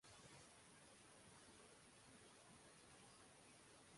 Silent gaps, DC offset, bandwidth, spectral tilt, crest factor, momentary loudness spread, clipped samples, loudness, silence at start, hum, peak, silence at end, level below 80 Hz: none; under 0.1%; 11.5 kHz; -2.5 dB/octave; 16 dB; 2 LU; under 0.1%; -65 LUFS; 0 s; none; -52 dBFS; 0 s; -84 dBFS